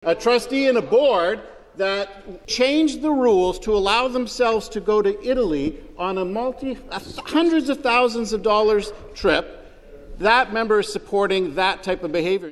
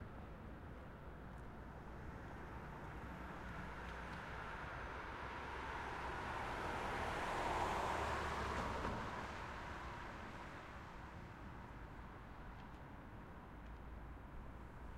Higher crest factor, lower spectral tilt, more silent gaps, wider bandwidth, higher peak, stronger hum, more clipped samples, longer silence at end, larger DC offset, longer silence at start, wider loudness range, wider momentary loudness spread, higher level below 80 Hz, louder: about the same, 18 dB vs 20 dB; about the same, -4 dB/octave vs -5 dB/octave; neither; second, 12.5 kHz vs 16 kHz; first, -2 dBFS vs -28 dBFS; neither; neither; about the same, 0 s vs 0 s; neither; about the same, 0.05 s vs 0 s; second, 2 LU vs 12 LU; second, 11 LU vs 14 LU; first, -44 dBFS vs -56 dBFS; first, -20 LUFS vs -48 LUFS